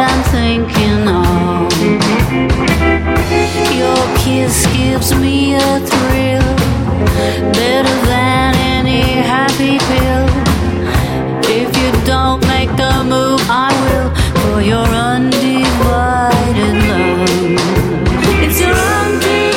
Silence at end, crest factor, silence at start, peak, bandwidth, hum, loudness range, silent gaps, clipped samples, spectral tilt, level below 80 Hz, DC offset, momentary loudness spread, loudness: 0 s; 12 dB; 0 s; 0 dBFS; 16.5 kHz; none; 1 LU; none; under 0.1%; -5 dB/octave; -22 dBFS; under 0.1%; 2 LU; -12 LUFS